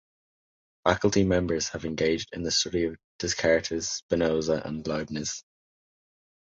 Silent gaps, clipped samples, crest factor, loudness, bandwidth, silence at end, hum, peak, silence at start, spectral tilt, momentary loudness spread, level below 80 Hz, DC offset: 3.04-3.19 s, 4.02-4.09 s; under 0.1%; 22 dB; -27 LUFS; 8 kHz; 1.05 s; none; -6 dBFS; 0.85 s; -4 dB/octave; 8 LU; -48 dBFS; under 0.1%